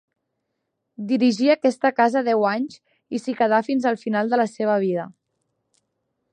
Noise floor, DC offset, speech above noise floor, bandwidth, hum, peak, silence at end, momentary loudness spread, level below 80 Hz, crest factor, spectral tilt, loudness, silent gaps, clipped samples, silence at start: -78 dBFS; under 0.1%; 57 dB; 9.8 kHz; none; -4 dBFS; 1.25 s; 11 LU; -76 dBFS; 18 dB; -6 dB/octave; -21 LUFS; none; under 0.1%; 1 s